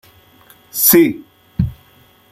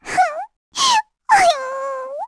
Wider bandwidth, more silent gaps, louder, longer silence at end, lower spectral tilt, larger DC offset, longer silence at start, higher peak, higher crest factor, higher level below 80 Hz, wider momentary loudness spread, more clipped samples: first, 16.5 kHz vs 11 kHz; second, none vs 0.56-0.72 s; first, -13 LUFS vs -17 LUFS; first, 0.6 s vs 0 s; first, -4.5 dB/octave vs 0 dB/octave; neither; first, 0.75 s vs 0.05 s; about the same, 0 dBFS vs -2 dBFS; about the same, 18 dB vs 16 dB; first, -40 dBFS vs -54 dBFS; first, 19 LU vs 13 LU; neither